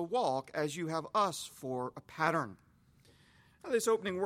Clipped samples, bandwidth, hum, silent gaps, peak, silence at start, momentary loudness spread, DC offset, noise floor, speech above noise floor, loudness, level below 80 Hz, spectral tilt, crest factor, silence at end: under 0.1%; 16.5 kHz; none; none; -14 dBFS; 0 s; 10 LU; under 0.1%; -65 dBFS; 31 dB; -35 LUFS; -74 dBFS; -4.5 dB/octave; 22 dB; 0 s